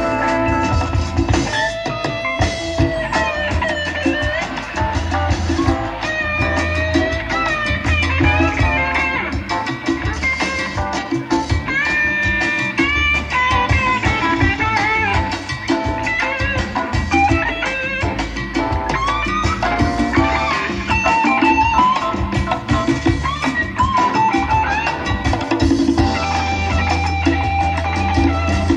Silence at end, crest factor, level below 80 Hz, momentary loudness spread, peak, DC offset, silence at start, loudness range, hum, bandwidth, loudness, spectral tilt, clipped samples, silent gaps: 0 s; 16 dB; -28 dBFS; 6 LU; 0 dBFS; under 0.1%; 0 s; 3 LU; none; 11 kHz; -17 LUFS; -5.5 dB/octave; under 0.1%; none